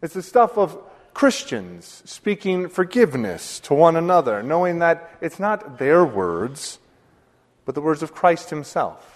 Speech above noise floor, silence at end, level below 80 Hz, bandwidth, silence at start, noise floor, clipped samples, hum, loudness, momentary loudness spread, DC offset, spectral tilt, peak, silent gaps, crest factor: 39 dB; 0.2 s; -62 dBFS; 13.5 kHz; 0 s; -59 dBFS; under 0.1%; none; -20 LUFS; 15 LU; under 0.1%; -5.5 dB/octave; 0 dBFS; none; 20 dB